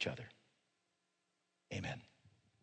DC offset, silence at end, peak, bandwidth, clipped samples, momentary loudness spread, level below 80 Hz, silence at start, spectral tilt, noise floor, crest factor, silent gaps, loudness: under 0.1%; 0.35 s; -26 dBFS; 9 kHz; under 0.1%; 15 LU; -74 dBFS; 0 s; -4.5 dB/octave; -84 dBFS; 24 dB; none; -47 LUFS